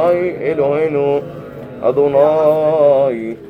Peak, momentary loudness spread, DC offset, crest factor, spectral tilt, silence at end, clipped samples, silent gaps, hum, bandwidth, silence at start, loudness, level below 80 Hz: -2 dBFS; 9 LU; under 0.1%; 14 dB; -8.5 dB/octave; 0 s; under 0.1%; none; none; 5.4 kHz; 0 s; -14 LUFS; -52 dBFS